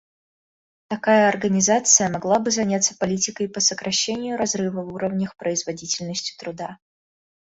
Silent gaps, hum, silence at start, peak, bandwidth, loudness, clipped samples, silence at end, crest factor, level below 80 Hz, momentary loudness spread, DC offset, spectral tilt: none; none; 0.9 s; -2 dBFS; 8 kHz; -21 LUFS; under 0.1%; 0.85 s; 22 dB; -60 dBFS; 12 LU; under 0.1%; -3 dB/octave